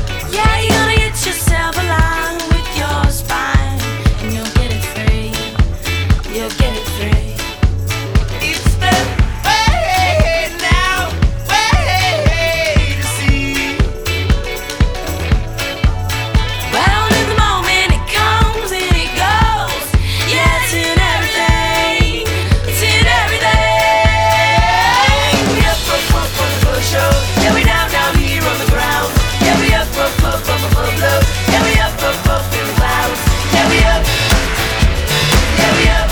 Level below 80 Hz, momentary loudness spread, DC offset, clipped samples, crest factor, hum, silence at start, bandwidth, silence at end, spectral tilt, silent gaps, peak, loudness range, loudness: -18 dBFS; 6 LU; under 0.1%; under 0.1%; 12 dB; none; 0 s; over 20 kHz; 0 s; -4 dB/octave; none; 0 dBFS; 5 LU; -13 LUFS